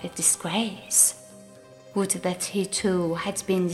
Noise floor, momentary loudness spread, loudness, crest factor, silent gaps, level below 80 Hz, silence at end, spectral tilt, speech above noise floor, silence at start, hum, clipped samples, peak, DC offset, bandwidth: -48 dBFS; 10 LU; -24 LUFS; 20 dB; none; -60 dBFS; 0 s; -3 dB/octave; 23 dB; 0 s; none; under 0.1%; -6 dBFS; under 0.1%; 15.5 kHz